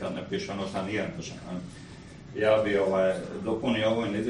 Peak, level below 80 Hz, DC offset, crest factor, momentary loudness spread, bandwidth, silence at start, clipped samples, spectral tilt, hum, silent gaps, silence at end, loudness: -12 dBFS; -56 dBFS; under 0.1%; 18 dB; 17 LU; 11 kHz; 0 s; under 0.1%; -6 dB/octave; none; none; 0 s; -28 LUFS